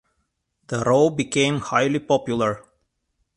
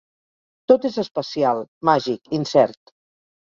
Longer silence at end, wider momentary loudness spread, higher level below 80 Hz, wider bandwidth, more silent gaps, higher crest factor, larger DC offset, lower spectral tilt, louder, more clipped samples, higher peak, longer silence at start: about the same, 0.75 s vs 0.7 s; about the same, 7 LU vs 8 LU; first, -56 dBFS vs -64 dBFS; first, 11 kHz vs 7.6 kHz; second, none vs 1.68-1.81 s; about the same, 18 dB vs 20 dB; neither; about the same, -5 dB/octave vs -6 dB/octave; about the same, -21 LUFS vs -20 LUFS; neither; about the same, -4 dBFS vs -2 dBFS; about the same, 0.7 s vs 0.7 s